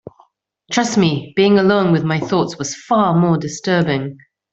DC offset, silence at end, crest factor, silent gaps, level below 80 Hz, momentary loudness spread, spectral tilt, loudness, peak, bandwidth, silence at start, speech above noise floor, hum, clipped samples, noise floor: under 0.1%; 0.35 s; 14 dB; none; -54 dBFS; 9 LU; -5.5 dB/octave; -16 LUFS; -2 dBFS; 8 kHz; 0.7 s; 39 dB; none; under 0.1%; -55 dBFS